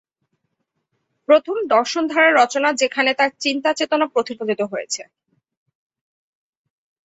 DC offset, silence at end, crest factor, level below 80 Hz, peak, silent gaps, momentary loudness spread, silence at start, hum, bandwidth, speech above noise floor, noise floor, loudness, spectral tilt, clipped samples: under 0.1%; 2 s; 18 dB; -72 dBFS; -2 dBFS; none; 10 LU; 1.3 s; none; 8 kHz; 56 dB; -74 dBFS; -18 LUFS; -2 dB/octave; under 0.1%